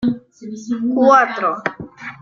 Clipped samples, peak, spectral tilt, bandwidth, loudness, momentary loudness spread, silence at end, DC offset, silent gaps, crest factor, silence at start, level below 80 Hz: under 0.1%; 0 dBFS; -5.5 dB/octave; 7.4 kHz; -16 LUFS; 20 LU; 0.05 s; under 0.1%; none; 18 dB; 0 s; -56 dBFS